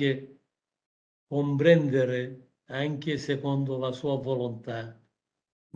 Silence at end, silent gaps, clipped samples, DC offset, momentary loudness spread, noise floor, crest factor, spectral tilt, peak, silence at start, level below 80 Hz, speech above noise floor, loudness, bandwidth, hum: 0.8 s; 0.86-1.27 s; under 0.1%; under 0.1%; 16 LU; -74 dBFS; 22 dB; -7.5 dB/octave; -6 dBFS; 0 s; -70 dBFS; 47 dB; -28 LUFS; 7.6 kHz; none